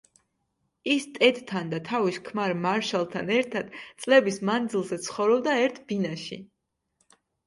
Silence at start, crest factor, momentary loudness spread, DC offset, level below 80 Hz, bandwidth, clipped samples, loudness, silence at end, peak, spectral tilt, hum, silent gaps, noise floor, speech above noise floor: 0.85 s; 22 dB; 13 LU; under 0.1%; -72 dBFS; 11.5 kHz; under 0.1%; -26 LUFS; 1 s; -4 dBFS; -4.5 dB/octave; none; none; -76 dBFS; 50 dB